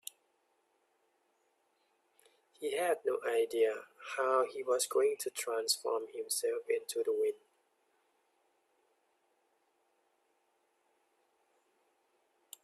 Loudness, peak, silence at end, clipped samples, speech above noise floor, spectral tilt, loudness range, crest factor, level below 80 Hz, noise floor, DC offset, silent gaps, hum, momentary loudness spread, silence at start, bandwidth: -34 LUFS; -16 dBFS; 5.3 s; under 0.1%; 43 dB; -0.5 dB/octave; 8 LU; 22 dB; under -90 dBFS; -77 dBFS; under 0.1%; none; none; 7 LU; 2.6 s; 15 kHz